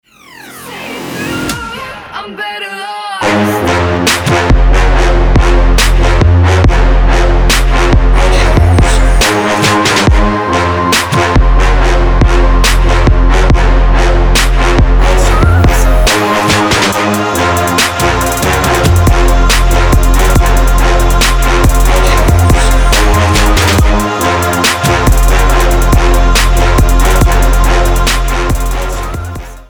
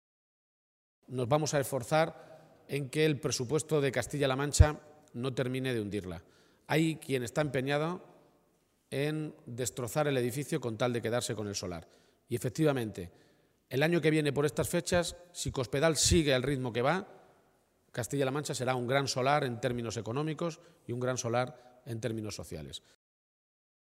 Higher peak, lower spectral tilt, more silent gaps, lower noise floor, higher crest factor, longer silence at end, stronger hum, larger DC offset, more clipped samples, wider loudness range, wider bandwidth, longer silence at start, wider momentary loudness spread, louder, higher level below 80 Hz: first, 0 dBFS vs -6 dBFS; about the same, -4.5 dB/octave vs -5 dB/octave; neither; second, -33 dBFS vs -72 dBFS; second, 8 dB vs 26 dB; second, 0.05 s vs 1.15 s; neither; neither; neither; second, 2 LU vs 5 LU; first, 20 kHz vs 16 kHz; second, 0.4 s vs 1.1 s; second, 9 LU vs 14 LU; first, -10 LUFS vs -32 LUFS; first, -10 dBFS vs -46 dBFS